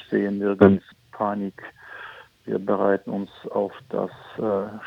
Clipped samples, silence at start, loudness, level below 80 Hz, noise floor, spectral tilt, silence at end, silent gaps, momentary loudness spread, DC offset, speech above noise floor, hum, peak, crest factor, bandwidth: under 0.1%; 0.1 s; -24 LUFS; -64 dBFS; -43 dBFS; -9.5 dB/octave; 0 s; none; 22 LU; under 0.1%; 20 dB; none; 0 dBFS; 24 dB; 5.6 kHz